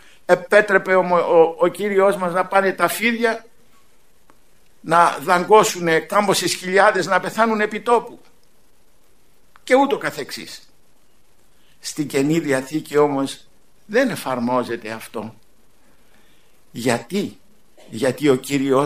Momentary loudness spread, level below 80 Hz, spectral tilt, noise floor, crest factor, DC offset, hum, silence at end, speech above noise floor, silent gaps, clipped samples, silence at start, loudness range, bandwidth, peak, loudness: 16 LU; -62 dBFS; -4.5 dB/octave; -59 dBFS; 20 dB; 0.5%; none; 0 s; 41 dB; none; under 0.1%; 0.3 s; 9 LU; 15.5 kHz; 0 dBFS; -18 LUFS